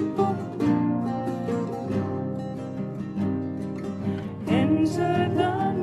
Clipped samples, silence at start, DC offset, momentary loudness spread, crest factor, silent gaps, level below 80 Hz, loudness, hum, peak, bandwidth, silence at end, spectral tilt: under 0.1%; 0 s; under 0.1%; 9 LU; 16 dB; none; -56 dBFS; -26 LUFS; none; -10 dBFS; 12.5 kHz; 0 s; -8 dB/octave